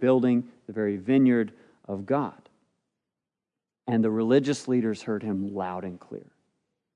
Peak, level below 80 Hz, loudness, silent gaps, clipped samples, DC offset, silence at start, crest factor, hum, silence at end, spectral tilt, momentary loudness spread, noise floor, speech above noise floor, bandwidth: -8 dBFS; -78 dBFS; -26 LUFS; none; under 0.1%; under 0.1%; 0 s; 18 dB; none; 0.75 s; -7 dB/octave; 16 LU; -89 dBFS; 63 dB; 10.5 kHz